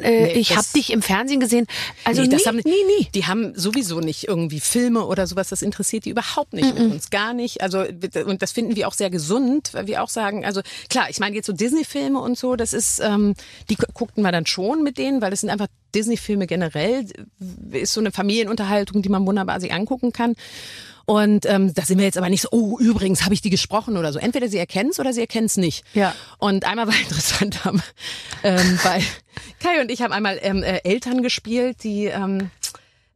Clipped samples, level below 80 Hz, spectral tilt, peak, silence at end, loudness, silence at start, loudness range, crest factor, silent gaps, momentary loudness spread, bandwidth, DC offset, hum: under 0.1%; -48 dBFS; -4 dB/octave; -4 dBFS; 0.4 s; -20 LUFS; 0 s; 4 LU; 16 dB; none; 8 LU; 15 kHz; under 0.1%; none